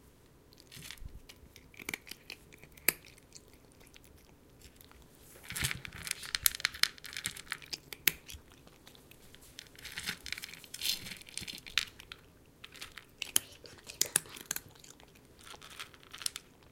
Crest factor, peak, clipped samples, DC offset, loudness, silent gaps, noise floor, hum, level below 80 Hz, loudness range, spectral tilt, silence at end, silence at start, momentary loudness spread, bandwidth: 40 dB; 0 dBFS; under 0.1%; under 0.1%; -36 LUFS; none; -61 dBFS; none; -60 dBFS; 7 LU; 0 dB/octave; 0 s; 0.05 s; 25 LU; 17 kHz